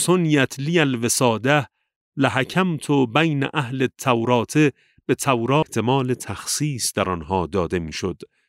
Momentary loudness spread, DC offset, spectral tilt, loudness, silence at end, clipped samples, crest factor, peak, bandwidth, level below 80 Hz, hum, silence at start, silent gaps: 8 LU; under 0.1%; -4.5 dB/octave; -21 LUFS; 0.25 s; under 0.1%; 18 dB; -2 dBFS; 16 kHz; -52 dBFS; none; 0 s; 1.96-2.12 s